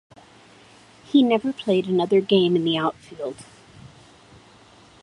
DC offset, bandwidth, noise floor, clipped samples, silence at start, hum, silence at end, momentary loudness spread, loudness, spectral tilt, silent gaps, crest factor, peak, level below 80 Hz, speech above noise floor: under 0.1%; 11 kHz; -51 dBFS; under 0.1%; 1.15 s; none; 1.15 s; 15 LU; -21 LUFS; -6.5 dB/octave; none; 18 dB; -4 dBFS; -64 dBFS; 30 dB